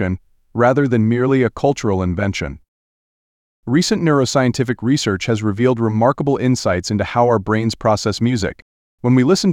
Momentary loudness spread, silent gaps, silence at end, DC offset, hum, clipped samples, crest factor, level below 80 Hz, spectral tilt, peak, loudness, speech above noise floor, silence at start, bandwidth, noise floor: 7 LU; 2.68-3.63 s, 8.62-8.98 s; 0 s; under 0.1%; none; under 0.1%; 16 dB; -46 dBFS; -6 dB/octave; -2 dBFS; -17 LUFS; over 74 dB; 0 s; 14 kHz; under -90 dBFS